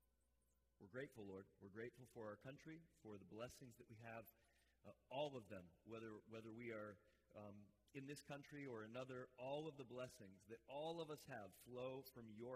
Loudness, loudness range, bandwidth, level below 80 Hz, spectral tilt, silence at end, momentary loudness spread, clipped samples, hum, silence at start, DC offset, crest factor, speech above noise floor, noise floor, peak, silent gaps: -56 LUFS; 5 LU; 15.5 kHz; -86 dBFS; -5.5 dB/octave; 0 s; 11 LU; under 0.1%; none; 0.8 s; under 0.1%; 20 dB; 29 dB; -85 dBFS; -36 dBFS; none